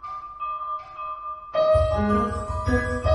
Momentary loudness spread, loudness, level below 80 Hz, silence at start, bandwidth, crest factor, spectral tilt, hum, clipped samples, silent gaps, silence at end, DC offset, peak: 13 LU; -25 LUFS; -34 dBFS; 0 s; 11.5 kHz; 16 dB; -7.5 dB/octave; none; under 0.1%; none; 0 s; under 0.1%; -8 dBFS